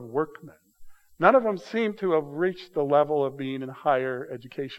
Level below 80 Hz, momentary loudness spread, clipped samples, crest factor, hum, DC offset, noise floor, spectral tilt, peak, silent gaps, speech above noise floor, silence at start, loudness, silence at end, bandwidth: -66 dBFS; 13 LU; under 0.1%; 22 dB; none; under 0.1%; -46 dBFS; -7 dB/octave; -4 dBFS; none; 20 dB; 0 s; -26 LUFS; 0 s; 12.5 kHz